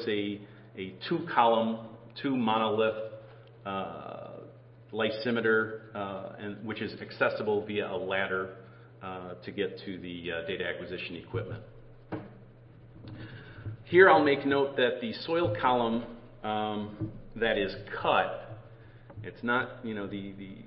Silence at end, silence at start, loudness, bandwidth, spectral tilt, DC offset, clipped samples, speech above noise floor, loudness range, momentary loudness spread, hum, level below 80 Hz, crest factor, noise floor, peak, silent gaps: 0 s; 0 s; -30 LUFS; 5.8 kHz; -9.5 dB/octave; under 0.1%; under 0.1%; 23 dB; 11 LU; 19 LU; none; -60 dBFS; 26 dB; -53 dBFS; -6 dBFS; none